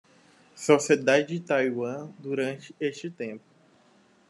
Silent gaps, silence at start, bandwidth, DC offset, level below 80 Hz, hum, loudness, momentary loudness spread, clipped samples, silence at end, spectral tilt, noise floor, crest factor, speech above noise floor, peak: none; 0.55 s; 12 kHz; under 0.1%; -78 dBFS; none; -27 LUFS; 16 LU; under 0.1%; 0.9 s; -4.5 dB/octave; -61 dBFS; 22 dB; 35 dB; -6 dBFS